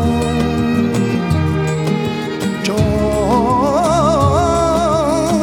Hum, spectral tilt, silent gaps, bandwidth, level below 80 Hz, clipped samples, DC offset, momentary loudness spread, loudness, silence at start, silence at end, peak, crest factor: none; -6.5 dB/octave; none; 17.5 kHz; -30 dBFS; under 0.1%; under 0.1%; 5 LU; -15 LUFS; 0 s; 0 s; -2 dBFS; 12 dB